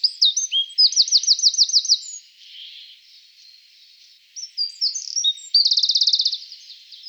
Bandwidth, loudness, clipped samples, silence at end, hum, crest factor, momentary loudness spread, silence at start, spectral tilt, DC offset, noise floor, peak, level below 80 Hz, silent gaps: over 20 kHz; -16 LUFS; under 0.1%; 0 s; 50 Hz at -95 dBFS; 16 dB; 23 LU; 0.05 s; 10 dB/octave; under 0.1%; -51 dBFS; -4 dBFS; under -90 dBFS; none